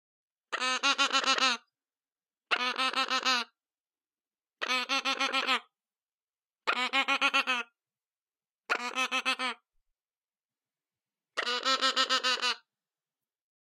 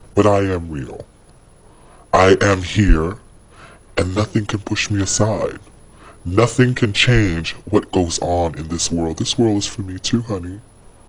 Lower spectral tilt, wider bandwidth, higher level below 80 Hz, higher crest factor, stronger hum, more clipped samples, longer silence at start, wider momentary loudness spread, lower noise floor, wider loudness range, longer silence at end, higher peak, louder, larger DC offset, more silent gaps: second, 1.5 dB/octave vs -5 dB/octave; first, 16.5 kHz vs 11 kHz; second, under -90 dBFS vs -30 dBFS; about the same, 22 dB vs 18 dB; neither; neither; first, 0.5 s vs 0 s; second, 10 LU vs 13 LU; first, under -90 dBFS vs -47 dBFS; about the same, 5 LU vs 3 LU; first, 1.1 s vs 0.5 s; second, -10 dBFS vs 0 dBFS; second, -28 LUFS vs -18 LUFS; neither; first, 6.14-6.27 s, 8.22-8.26 s, 10.17-10.21 s, 10.45-10.49 s vs none